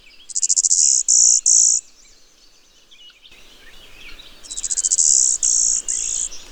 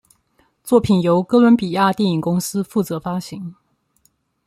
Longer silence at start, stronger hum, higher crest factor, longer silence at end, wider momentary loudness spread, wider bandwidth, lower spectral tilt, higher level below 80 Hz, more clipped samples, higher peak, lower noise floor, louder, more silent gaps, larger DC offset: second, 0.3 s vs 0.65 s; neither; about the same, 18 dB vs 18 dB; second, 0 s vs 0.95 s; second, 12 LU vs 18 LU; first, over 20 kHz vs 15 kHz; second, 4 dB/octave vs -6.5 dB/octave; about the same, -50 dBFS vs -54 dBFS; neither; about the same, -2 dBFS vs -2 dBFS; second, -51 dBFS vs -62 dBFS; first, -14 LUFS vs -17 LUFS; neither; neither